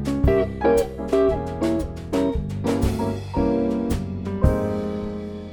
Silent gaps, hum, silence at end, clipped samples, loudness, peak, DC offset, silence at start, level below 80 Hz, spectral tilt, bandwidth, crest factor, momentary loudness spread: none; none; 0 s; under 0.1%; -23 LUFS; -4 dBFS; under 0.1%; 0 s; -30 dBFS; -7.5 dB/octave; 19 kHz; 18 dB; 7 LU